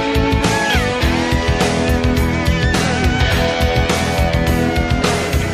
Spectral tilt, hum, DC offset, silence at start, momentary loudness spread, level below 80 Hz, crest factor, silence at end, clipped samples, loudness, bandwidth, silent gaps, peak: -5 dB/octave; none; under 0.1%; 0 s; 1 LU; -22 dBFS; 14 dB; 0 s; under 0.1%; -16 LUFS; 15 kHz; none; -2 dBFS